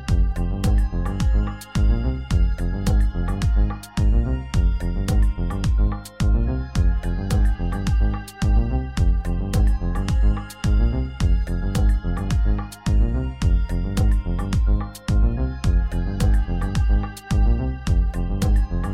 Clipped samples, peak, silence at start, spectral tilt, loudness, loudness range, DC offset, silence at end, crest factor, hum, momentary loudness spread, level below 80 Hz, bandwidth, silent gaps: under 0.1%; -8 dBFS; 0 s; -7 dB/octave; -23 LUFS; 1 LU; 0.3%; 0 s; 10 dB; none; 3 LU; -20 dBFS; 11.5 kHz; none